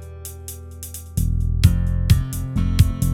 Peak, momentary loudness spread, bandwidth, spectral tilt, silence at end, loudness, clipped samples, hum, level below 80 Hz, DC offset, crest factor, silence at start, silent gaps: 0 dBFS; 16 LU; 17 kHz; -6 dB/octave; 0 s; -20 LUFS; under 0.1%; none; -24 dBFS; under 0.1%; 20 dB; 0 s; none